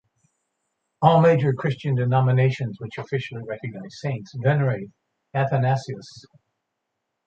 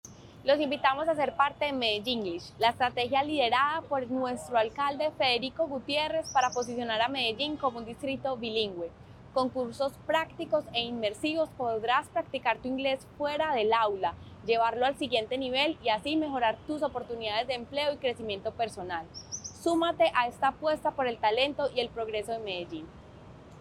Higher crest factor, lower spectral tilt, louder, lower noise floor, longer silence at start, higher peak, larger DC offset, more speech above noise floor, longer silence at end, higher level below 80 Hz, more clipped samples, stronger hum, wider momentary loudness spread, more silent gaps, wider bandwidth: about the same, 22 dB vs 20 dB; first, -8 dB/octave vs -3.5 dB/octave; first, -22 LUFS vs -30 LUFS; first, -79 dBFS vs -50 dBFS; first, 1 s vs 0.05 s; first, -2 dBFS vs -10 dBFS; neither; first, 58 dB vs 20 dB; first, 1.05 s vs 0 s; about the same, -60 dBFS vs -60 dBFS; neither; neither; first, 15 LU vs 8 LU; neither; second, 7.6 kHz vs 14 kHz